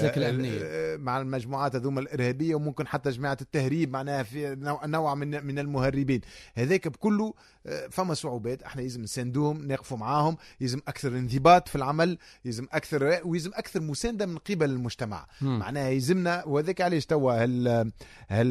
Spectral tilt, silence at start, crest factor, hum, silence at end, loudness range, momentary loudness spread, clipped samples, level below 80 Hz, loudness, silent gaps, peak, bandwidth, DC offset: -6.5 dB/octave; 0 s; 22 dB; none; 0 s; 4 LU; 8 LU; under 0.1%; -54 dBFS; -28 LUFS; none; -6 dBFS; 14 kHz; under 0.1%